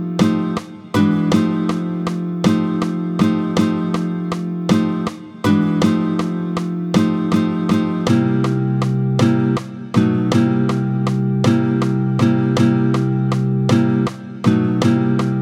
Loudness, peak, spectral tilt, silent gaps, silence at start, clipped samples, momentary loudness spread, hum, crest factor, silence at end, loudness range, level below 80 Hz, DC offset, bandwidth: -18 LUFS; 0 dBFS; -7.5 dB/octave; none; 0 s; under 0.1%; 6 LU; none; 16 dB; 0 s; 2 LU; -50 dBFS; under 0.1%; 12.5 kHz